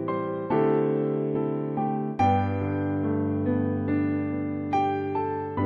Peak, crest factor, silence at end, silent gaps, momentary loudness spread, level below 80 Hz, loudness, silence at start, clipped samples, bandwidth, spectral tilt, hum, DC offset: -12 dBFS; 14 dB; 0 s; none; 5 LU; -62 dBFS; -26 LUFS; 0 s; under 0.1%; 6 kHz; -9.5 dB/octave; none; under 0.1%